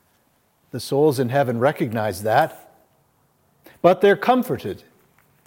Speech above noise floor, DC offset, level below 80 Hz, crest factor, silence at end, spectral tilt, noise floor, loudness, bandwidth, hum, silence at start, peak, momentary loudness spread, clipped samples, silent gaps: 44 dB; under 0.1%; -66 dBFS; 20 dB; 0.7 s; -6 dB/octave; -63 dBFS; -20 LUFS; 17 kHz; none; 0.75 s; -2 dBFS; 15 LU; under 0.1%; none